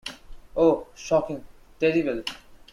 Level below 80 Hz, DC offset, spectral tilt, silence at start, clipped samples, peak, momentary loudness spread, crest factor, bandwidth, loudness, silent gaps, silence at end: -50 dBFS; under 0.1%; -5.5 dB/octave; 0.05 s; under 0.1%; -8 dBFS; 16 LU; 18 dB; 13 kHz; -25 LUFS; none; 0.15 s